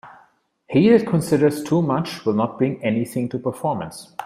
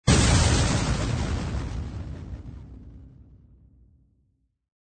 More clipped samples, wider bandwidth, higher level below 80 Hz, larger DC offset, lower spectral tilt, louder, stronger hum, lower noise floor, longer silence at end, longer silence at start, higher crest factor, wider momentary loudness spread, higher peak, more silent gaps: neither; first, 15.5 kHz vs 9.4 kHz; second, -58 dBFS vs -32 dBFS; neither; first, -7 dB/octave vs -4.5 dB/octave; first, -20 LUFS vs -24 LUFS; neither; second, -58 dBFS vs -69 dBFS; second, 0 s vs 1.65 s; about the same, 0.05 s vs 0.05 s; about the same, 18 dB vs 20 dB; second, 10 LU vs 24 LU; first, -2 dBFS vs -6 dBFS; neither